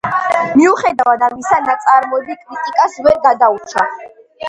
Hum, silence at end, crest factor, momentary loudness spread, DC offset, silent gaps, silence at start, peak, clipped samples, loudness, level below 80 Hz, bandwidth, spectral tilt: none; 0 s; 14 dB; 9 LU; under 0.1%; none; 0.05 s; 0 dBFS; under 0.1%; -13 LUFS; -52 dBFS; 11 kHz; -4.5 dB/octave